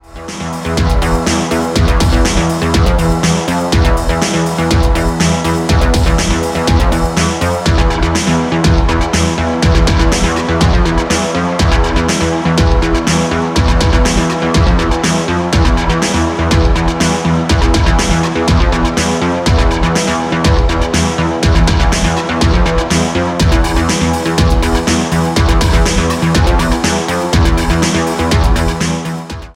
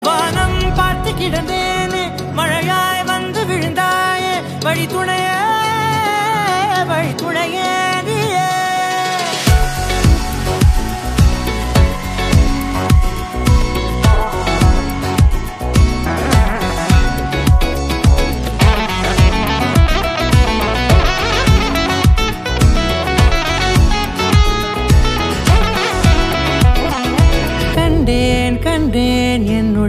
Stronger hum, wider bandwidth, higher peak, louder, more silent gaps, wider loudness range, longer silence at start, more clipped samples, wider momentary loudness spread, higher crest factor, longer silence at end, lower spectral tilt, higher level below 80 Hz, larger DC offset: neither; about the same, 16 kHz vs 15.5 kHz; about the same, 0 dBFS vs 0 dBFS; about the same, -13 LUFS vs -15 LUFS; neither; about the same, 0 LU vs 2 LU; about the same, 0.1 s vs 0 s; neither; about the same, 3 LU vs 5 LU; about the same, 10 dB vs 14 dB; about the same, 0.05 s vs 0 s; about the same, -5 dB/octave vs -5 dB/octave; about the same, -16 dBFS vs -18 dBFS; neither